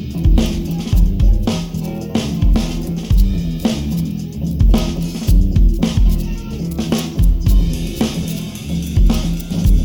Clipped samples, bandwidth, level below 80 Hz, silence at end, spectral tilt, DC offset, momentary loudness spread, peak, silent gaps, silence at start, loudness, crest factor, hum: under 0.1%; 18 kHz; -16 dBFS; 0 s; -6.5 dB/octave; under 0.1%; 8 LU; -2 dBFS; none; 0 s; -18 LUFS; 14 dB; none